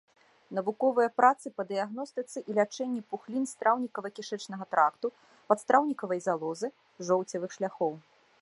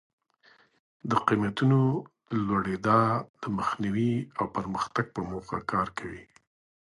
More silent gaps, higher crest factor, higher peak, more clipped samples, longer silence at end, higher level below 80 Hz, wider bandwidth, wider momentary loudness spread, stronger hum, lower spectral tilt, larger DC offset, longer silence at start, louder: second, none vs 3.29-3.34 s; about the same, 22 dB vs 22 dB; about the same, -8 dBFS vs -6 dBFS; neither; second, 0.45 s vs 0.65 s; second, -86 dBFS vs -58 dBFS; about the same, 11.5 kHz vs 11.5 kHz; about the same, 13 LU vs 11 LU; neither; second, -5 dB/octave vs -7.5 dB/octave; neither; second, 0.5 s vs 1.05 s; about the same, -30 LUFS vs -28 LUFS